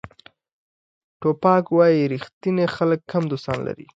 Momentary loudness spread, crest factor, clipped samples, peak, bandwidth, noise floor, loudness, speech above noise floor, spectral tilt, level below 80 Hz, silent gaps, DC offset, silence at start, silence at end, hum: 10 LU; 18 dB; under 0.1%; -4 dBFS; 7.8 kHz; -44 dBFS; -21 LUFS; 24 dB; -8.5 dB/octave; -58 dBFS; 0.52-1.20 s, 2.33-2.41 s; under 0.1%; 0.05 s; 0.1 s; none